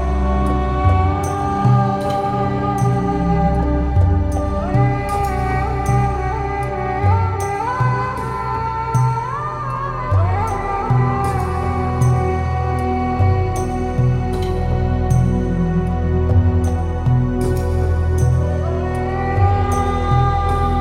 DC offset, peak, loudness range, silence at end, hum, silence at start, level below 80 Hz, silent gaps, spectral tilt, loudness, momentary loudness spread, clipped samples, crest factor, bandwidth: under 0.1%; -2 dBFS; 2 LU; 0 s; none; 0 s; -24 dBFS; none; -8 dB/octave; -18 LUFS; 5 LU; under 0.1%; 14 dB; 12 kHz